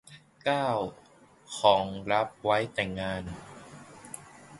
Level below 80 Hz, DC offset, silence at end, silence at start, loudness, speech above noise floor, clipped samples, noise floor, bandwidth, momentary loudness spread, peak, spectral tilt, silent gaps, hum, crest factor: -58 dBFS; under 0.1%; 0 s; 0.1 s; -29 LUFS; 20 dB; under 0.1%; -49 dBFS; 11.5 kHz; 21 LU; -8 dBFS; -4.5 dB/octave; none; none; 24 dB